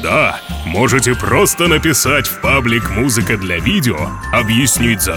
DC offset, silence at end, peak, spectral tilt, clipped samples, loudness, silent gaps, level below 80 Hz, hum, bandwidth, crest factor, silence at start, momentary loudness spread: under 0.1%; 0 s; -2 dBFS; -3.5 dB/octave; under 0.1%; -13 LUFS; none; -28 dBFS; none; 19.5 kHz; 12 dB; 0 s; 5 LU